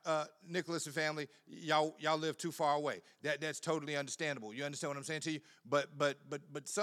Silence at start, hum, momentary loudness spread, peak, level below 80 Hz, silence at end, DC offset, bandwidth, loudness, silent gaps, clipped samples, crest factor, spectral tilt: 0.05 s; none; 10 LU; -18 dBFS; under -90 dBFS; 0 s; under 0.1%; 15 kHz; -38 LUFS; none; under 0.1%; 22 dB; -3.5 dB/octave